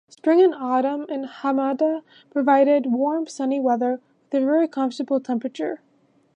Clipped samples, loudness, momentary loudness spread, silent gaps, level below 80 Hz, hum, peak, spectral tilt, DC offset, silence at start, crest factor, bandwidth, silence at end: under 0.1%; -22 LUFS; 12 LU; none; -82 dBFS; none; -6 dBFS; -5.5 dB/octave; under 0.1%; 0.25 s; 16 dB; 9.4 kHz; 0.6 s